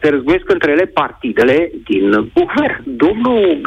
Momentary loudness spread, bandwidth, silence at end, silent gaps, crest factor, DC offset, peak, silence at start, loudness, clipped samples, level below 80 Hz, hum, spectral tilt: 5 LU; 8.4 kHz; 0 s; none; 10 dB; under 0.1%; -4 dBFS; 0 s; -14 LUFS; under 0.1%; -42 dBFS; none; -7 dB/octave